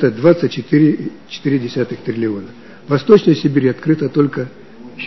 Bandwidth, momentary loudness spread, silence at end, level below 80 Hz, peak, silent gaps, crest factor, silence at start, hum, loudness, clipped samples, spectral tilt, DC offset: 6.2 kHz; 16 LU; 0 s; -56 dBFS; 0 dBFS; none; 16 dB; 0 s; none; -15 LUFS; 0.1%; -8 dB/octave; 0.7%